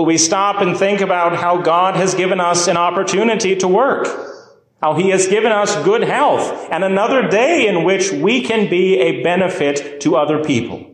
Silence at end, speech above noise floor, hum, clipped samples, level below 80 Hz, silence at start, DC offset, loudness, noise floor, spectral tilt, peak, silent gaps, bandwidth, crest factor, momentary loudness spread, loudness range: 0.05 s; 27 dB; none; under 0.1%; -60 dBFS; 0 s; under 0.1%; -15 LUFS; -42 dBFS; -4 dB/octave; -2 dBFS; none; 10.5 kHz; 12 dB; 5 LU; 1 LU